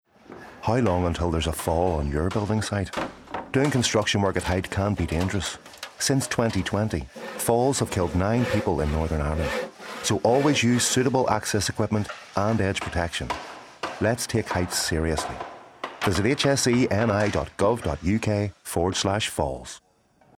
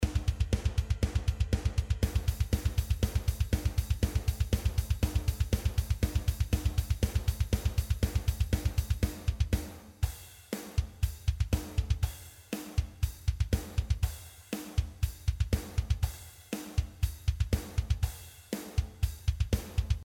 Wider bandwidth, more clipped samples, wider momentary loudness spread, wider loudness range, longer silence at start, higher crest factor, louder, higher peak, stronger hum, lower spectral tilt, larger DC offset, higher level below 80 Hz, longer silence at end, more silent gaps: about the same, 17 kHz vs 18 kHz; neither; first, 12 LU vs 6 LU; about the same, 3 LU vs 3 LU; first, 0.3 s vs 0 s; about the same, 18 dB vs 16 dB; first, -25 LUFS vs -33 LUFS; first, -6 dBFS vs -14 dBFS; neither; about the same, -4.5 dB/octave vs -5.5 dB/octave; neither; second, -40 dBFS vs -34 dBFS; first, 0.6 s vs 0 s; neither